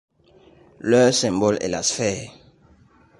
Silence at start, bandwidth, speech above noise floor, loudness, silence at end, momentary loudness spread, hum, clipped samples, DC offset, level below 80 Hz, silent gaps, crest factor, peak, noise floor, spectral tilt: 0.85 s; 11.5 kHz; 34 dB; -20 LUFS; 0.9 s; 15 LU; none; under 0.1%; under 0.1%; -54 dBFS; none; 18 dB; -6 dBFS; -54 dBFS; -4 dB/octave